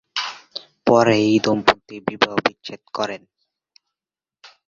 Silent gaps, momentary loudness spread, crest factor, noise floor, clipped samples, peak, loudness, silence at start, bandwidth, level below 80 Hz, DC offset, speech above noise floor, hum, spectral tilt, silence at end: none; 19 LU; 20 dB; under -90 dBFS; under 0.1%; 0 dBFS; -19 LUFS; 0.15 s; 7.6 kHz; -58 dBFS; under 0.1%; over 71 dB; none; -5 dB/octave; 1.5 s